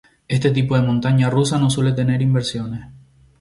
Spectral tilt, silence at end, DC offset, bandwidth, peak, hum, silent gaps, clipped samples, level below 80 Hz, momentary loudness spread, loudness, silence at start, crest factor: -6.5 dB/octave; 0.45 s; under 0.1%; 11.5 kHz; -4 dBFS; none; none; under 0.1%; -48 dBFS; 9 LU; -18 LUFS; 0.3 s; 14 dB